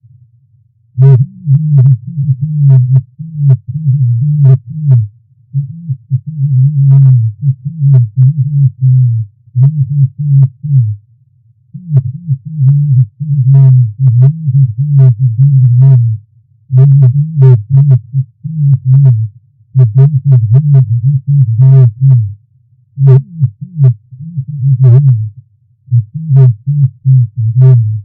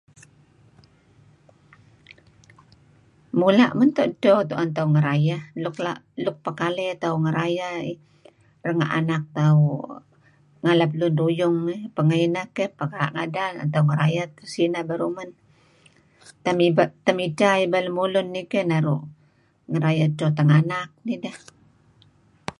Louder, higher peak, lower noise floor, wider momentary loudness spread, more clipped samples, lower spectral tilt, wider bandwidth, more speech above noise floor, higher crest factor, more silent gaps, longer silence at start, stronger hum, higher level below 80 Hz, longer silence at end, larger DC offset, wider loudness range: first, -9 LUFS vs -22 LUFS; first, 0 dBFS vs -4 dBFS; second, -49 dBFS vs -60 dBFS; about the same, 11 LU vs 11 LU; first, 2% vs under 0.1%; first, -14 dB/octave vs -7.5 dB/octave; second, 1.5 kHz vs 10.5 kHz; first, 43 dB vs 39 dB; second, 8 dB vs 20 dB; neither; second, 0.95 s vs 2.1 s; neither; first, -48 dBFS vs -66 dBFS; about the same, 0 s vs 0.1 s; neither; about the same, 4 LU vs 5 LU